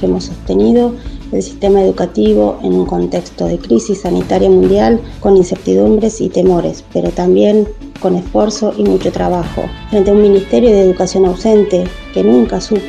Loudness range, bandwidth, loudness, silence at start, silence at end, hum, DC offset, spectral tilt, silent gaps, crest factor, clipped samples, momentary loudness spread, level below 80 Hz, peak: 2 LU; 9.6 kHz; -12 LUFS; 0 s; 0 s; none; under 0.1%; -7 dB/octave; none; 12 dB; under 0.1%; 9 LU; -30 dBFS; 0 dBFS